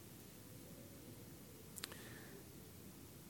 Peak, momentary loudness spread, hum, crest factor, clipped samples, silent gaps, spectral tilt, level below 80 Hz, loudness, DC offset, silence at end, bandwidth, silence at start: -22 dBFS; 7 LU; none; 34 dB; under 0.1%; none; -3.5 dB/octave; -72 dBFS; -55 LUFS; under 0.1%; 0 s; 17.5 kHz; 0 s